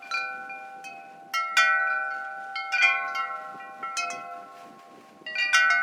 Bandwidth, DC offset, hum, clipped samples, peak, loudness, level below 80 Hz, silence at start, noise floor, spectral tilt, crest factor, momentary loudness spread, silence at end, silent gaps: 18.5 kHz; under 0.1%; none; under 0.1%; -8 dBFS; -25 LUFS; under -90 dBFS; 0 s; -50 dBFS; 1.5 dB/octave; 20 dB; 21 LU; 0 s; none